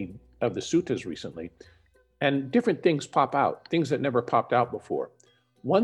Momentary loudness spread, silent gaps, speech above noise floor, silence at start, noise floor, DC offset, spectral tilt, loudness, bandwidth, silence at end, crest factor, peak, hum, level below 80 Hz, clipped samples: 15 LU; none; 25 dB; 0 s; -52 dBFS; under 0.1%; -6 dB/octave; -27 LUFS; 11 kHz; 0 s; 20 dB; -8 dBFS; none; -64 dBFS; under 0.1%